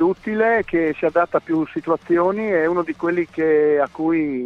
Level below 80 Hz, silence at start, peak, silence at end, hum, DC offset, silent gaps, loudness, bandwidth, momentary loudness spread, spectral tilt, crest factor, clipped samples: -54 dBFS; 0 s; -4 dBFS; 0 s; none; under 0.1%; none; -19 LUFS; 6 kHz; 5 LU; -8.5 dB/octave; 14 dB; under 0.1%